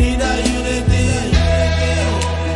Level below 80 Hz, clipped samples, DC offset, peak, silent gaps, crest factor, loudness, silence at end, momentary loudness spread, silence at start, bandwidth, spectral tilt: -22 dBFS; under 0.1%; under 0.1%; -2 dBFS; none; 14 dB; -16 LUFS; 0 s; 3 LU; 0 s; 11.5 kHz; -5 dB/octave